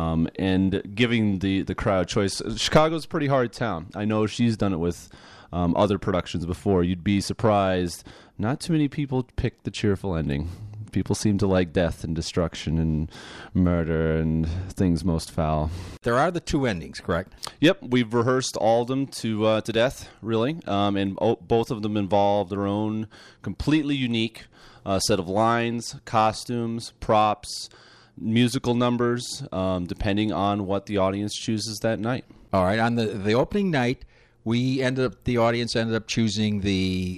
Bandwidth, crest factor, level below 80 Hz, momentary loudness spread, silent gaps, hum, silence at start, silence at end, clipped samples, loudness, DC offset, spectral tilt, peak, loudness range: 13.5 kHz; 18 dB; -44 dBFS; 8 LU; none; none; 0 s; 0 s; under 0.1%; -24 LUFS; under 0.1%; -6 dB/octave; -6 dBFS; 2 LU